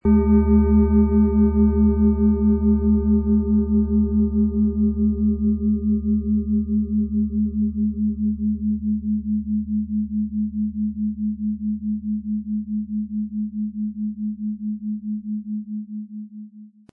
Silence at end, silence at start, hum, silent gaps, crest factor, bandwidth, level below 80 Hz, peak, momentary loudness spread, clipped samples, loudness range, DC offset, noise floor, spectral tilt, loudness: 0.25 s; 0.05 s; none; none; 14 dB; 2.4 kHz; -32 dBFS; -6 dBFS; 11 LU; under 0.1%; 9 LU; under 0.1%; -43 dBFS; -16 dB/octave; -21 LUFS